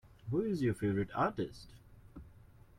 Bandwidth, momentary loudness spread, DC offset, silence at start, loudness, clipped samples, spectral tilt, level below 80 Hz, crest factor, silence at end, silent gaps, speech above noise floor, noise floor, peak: 15.5 kHz; 22 LU; under 0.1%; 0.25 s; -35 LUFS; under 0.1%; -8 dB/octave; -60 dBFS; 18 dB; 0.45 s; none; 24 dB; -59 dBFS; -20 dBFS